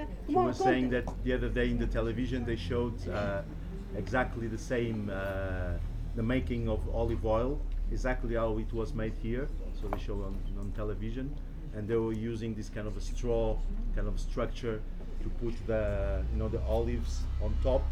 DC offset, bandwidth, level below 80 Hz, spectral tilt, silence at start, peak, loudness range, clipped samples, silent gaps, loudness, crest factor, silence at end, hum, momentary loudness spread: under 0.1%; 9.4 kHz; -36 dBFS; -7 dB/octave; 0 s; -16 dBFS; 4 LU; under 0.1%; none; -34 LUFS; 16 dB; 0 s; none; 9 LU